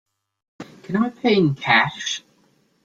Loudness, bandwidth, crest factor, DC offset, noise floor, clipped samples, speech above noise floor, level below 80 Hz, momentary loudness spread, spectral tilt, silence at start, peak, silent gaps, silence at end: -20 LUFS; 7.8 kHz; 20 dB; under 0.1%; -61 dBFS; under 0.1%; 42 dB; -62 dBFS; 12 LU; -4.5 dB/octave; 0.6 s; -2 dBFS; none; 0.65 s